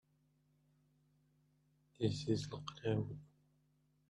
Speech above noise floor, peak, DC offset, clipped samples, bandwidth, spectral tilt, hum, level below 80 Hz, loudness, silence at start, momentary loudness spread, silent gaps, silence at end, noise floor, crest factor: 37 dB; -22 dBFS; under 0.1%; under 0.1%; 10.5 kHz; -6.5 dB/octave; 50 Hz at -55 dBFS; -72 dBFS; -41 LUFS; 2 s; 9 LU; none; 0.85 s; -77 dBFS; 22 dB